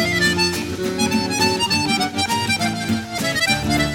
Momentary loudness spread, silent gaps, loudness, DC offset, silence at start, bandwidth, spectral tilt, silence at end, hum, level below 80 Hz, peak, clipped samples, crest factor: 6 LU; none; -19 LUFS; under 0.1%; 0 s; 17 kHz; -3.5 dB/octave; 0 s; none; -42 dBFS; -4 dBFS; under 0.1%; 16 dB